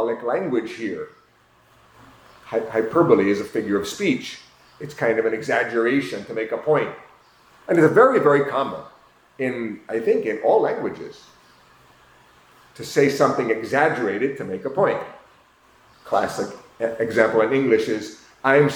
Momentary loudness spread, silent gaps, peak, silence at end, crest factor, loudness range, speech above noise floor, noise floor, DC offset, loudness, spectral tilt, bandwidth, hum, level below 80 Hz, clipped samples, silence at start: 14 LU; none; -2 dBFS; 0 s; 20 dB; 5 LU; 36 dB; -57 dBFS; under 0.1%; -21 LUFS; -6 dB/octave; 18.5 kHz; none; -64 dBFS; under 0.1%; 0 s